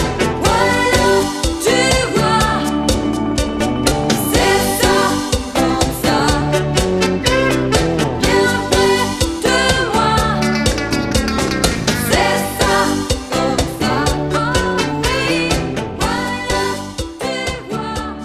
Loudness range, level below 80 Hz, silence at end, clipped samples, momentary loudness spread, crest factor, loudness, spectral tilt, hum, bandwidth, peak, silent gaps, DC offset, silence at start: 3 LU; -28 dBFS; 0 s; under 0.1%; 6 LU; 16 dB; -16 LUFS; -4 dB/octave; none; 14 kHz; 0 dBFS; none; under 0.1%; 0 s